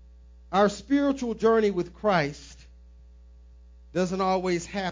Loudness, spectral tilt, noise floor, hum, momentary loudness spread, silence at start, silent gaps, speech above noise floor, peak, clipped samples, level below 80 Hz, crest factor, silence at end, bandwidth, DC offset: -26 LUFS; -6 dB/octave; -50 dBFS; none; 7 LU; 0.5 s; none; 25 dB; -8 dBFS; under 0.1%; -50 dBFS; 18 dB; 0 s; 7.6 kHz; under 0.1%